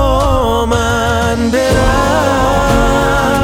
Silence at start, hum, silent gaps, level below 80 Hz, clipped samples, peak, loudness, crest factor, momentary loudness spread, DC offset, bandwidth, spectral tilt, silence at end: 0 s; none; none; -20 dBFS; under 0.1%; 0 dBFS; -12 LUFS; 10 dB; 2 LU; under 0.1%; 18 kHz; -5 dB/octave; 0 s